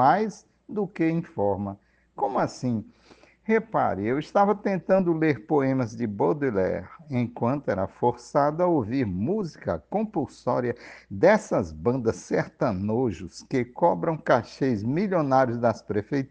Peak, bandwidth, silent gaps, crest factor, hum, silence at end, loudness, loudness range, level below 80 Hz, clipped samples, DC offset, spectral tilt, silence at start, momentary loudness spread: -6 dBFS; 9.2 kHz; none; 20 dB; none; 0.05 s; -26 LUFS; 3 LU; -60 dBFS; under 0.1%; under 0.1%; -7.5 dB/octave; 0 s; 9 LU